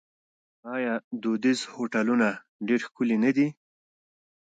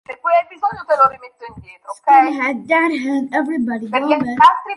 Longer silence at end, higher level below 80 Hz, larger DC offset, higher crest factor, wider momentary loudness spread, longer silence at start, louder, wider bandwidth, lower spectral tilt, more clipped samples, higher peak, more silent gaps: first, 0.95 s vs 0 s; second, -76 dBFS vs -56 dBFS; neither; about the same, 16 dB vs 16 dB; second, 8 LU vs 20 LU; first, 0.65 s vs 0.1 s; second, -27 LUFS vs -16 LUFS; second, 9.2 kHz vs 11.5 kHz; about the same, -5.5 dB/octave vs -5 dB/octave; neither; second, -12 dBFS vs 0 dBFS; first, 1.04-1.11 s, 2.49-2.59 s vs none